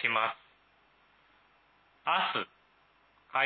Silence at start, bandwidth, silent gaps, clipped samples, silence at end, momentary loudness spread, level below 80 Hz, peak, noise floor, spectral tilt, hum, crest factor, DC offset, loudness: 0 s; 5.8 kHz; none; under 0.1%; 0 s; 14 LU; -82 dBFS; -14 dBFS; -66 dBFS; -6 dB/octave; none; 22 dB; under 0.1%; -32 LUFS